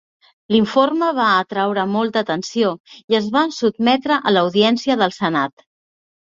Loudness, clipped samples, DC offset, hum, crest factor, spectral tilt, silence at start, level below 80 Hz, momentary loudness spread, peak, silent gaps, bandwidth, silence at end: -18 LUFS; under 0.1%; under 0.1%; none; 16 dB; -5 dB/octave; 0.5 s; -60 dBFS; 5 LU; -2 dBFS; 2.80-2.84 s, 3.04-3.08 s; 7.6 kHz; 0.85 s